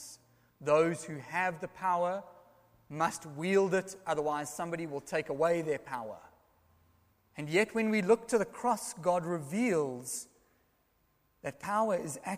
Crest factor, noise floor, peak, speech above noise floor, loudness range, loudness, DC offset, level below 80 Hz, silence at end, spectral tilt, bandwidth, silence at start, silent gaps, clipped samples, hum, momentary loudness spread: 20 dB; -73 dBFS; -14 dBFS; 41 dB; 4 LU; -32 LUFS; under 0.1%; -72 dBFS; 0 s; -5 dB/octave; 15.5 kHz; 0 s; none; under 0.1%; none; 13 LU